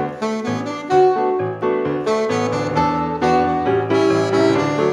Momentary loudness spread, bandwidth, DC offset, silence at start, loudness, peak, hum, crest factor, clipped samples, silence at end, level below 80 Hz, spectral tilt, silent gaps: 7 LU; 10.5 kHz; under 0.1%; 0 s; -18 LUFS; -4 dBFS; none; 14 dB; under 0.1%; 0 s; -48 dBFS; -6.5 dB/octave; none